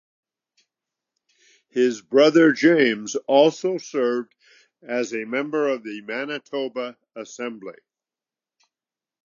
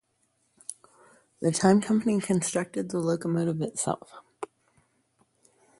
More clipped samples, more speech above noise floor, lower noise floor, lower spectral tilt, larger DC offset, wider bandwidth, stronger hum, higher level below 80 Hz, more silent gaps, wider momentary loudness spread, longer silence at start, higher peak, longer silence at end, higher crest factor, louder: neither; first, over 69 dB vs 46 dB; first, under -90 dBFS vs -72 dBFS; about the same, -4.5 dB/octave vs -5.5 dB/octave; neither; second, 7.4 kHz vs 11.5 kHz; neither; second, -82 dBFS vs -66 dBFS; neither; second, 17 LU vs 20 LU; first, 1.75 s vs 0.7 s; first, -2 dBFS vs -8 dBFS; first, 1.5 s vs 1.35 s; about the same, 20 dB vs 22 dB; first, -21 LUFS vs -27 LUFS